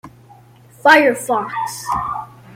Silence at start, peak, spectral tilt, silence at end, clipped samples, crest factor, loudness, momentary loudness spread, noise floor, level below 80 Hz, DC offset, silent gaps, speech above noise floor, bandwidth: 0.05 s; 0 dBFS; -3.5 dB/octave; 0.3 s; under 0.1%; 18 dB; -16 LUFS; 14 LU; -45 dBFS; -50 dBFS; under 0.1%; none; 30 dB; 16.5 kHz